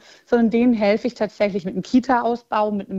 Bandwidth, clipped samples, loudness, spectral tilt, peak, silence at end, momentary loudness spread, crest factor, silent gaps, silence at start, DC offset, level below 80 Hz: 7.6 kHz; under 0.1%; -20 LUFS; -7 dB/octave; -4 dBFS; 0 s; 5 LU; 14 dB; none; 0.3 s; under 0.1%; -54 dBFS